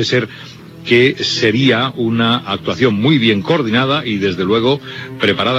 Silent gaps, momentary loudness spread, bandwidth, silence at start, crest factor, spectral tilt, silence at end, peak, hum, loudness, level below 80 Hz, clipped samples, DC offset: none; 8 LU; 12.5 kHz; 0 s; 14 dB; -5.5 dB/octave; 0 s; 0 dBFS; none; -14 LUFS; -52 dBFS; under 0.1%; under 0.1%